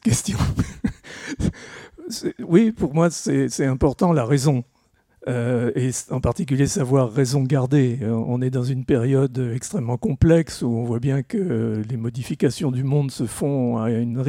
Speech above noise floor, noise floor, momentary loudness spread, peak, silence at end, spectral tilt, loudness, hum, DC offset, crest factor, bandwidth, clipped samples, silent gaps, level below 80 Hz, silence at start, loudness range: 41 dB; -62 dBFS; 9 LU; -2 dBFS; 0 s; -6.5 dB/octave; -21 LUFS; none; under 0.1%; 18 dB; 15.5 kHz; under 0.1%; none; -42 dBFS; 0.05 s; 2 LU